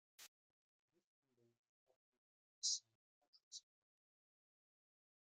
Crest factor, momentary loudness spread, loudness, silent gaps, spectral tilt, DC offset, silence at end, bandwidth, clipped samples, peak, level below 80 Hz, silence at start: 28 dB; 21 LU; -43 LUFS; 0.28-0.88 s, 1.04-1.23 s, 1.58-1.87 s, 1.96-2.62 s, 2.95-3.21 s, 3.27-3.33 s, 3.43-3.51 s; 4 dB/octave; under 0.1%; 1.75 s; 10 kHz; under 0.1%; -28 dBFS; under -90 dBFS; 0.2 s